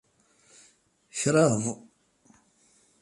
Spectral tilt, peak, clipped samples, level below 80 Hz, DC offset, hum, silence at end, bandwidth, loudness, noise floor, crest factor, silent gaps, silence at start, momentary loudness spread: -5 dB/octave; -8 dBFS; under 0.1%; -68 dBFS; under 0.1%; none; 1.25 s; 11.5 kHz; -26 LUFS; -64 dBFS; 22 dB; none; 1.15 s; 17 LU